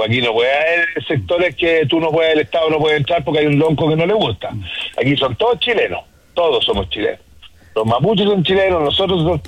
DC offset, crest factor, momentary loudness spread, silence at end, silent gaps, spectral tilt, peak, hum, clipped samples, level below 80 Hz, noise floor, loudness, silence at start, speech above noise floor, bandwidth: under 0.1%; 12 dB; 7 LU; 0 s; none; -6.5 dB/octave; -4 dBFS; none; under 0.1%; -42 dBFS; -43 dBFS; -16 LUFS; 0 s; 27 dB; 10.5 kHz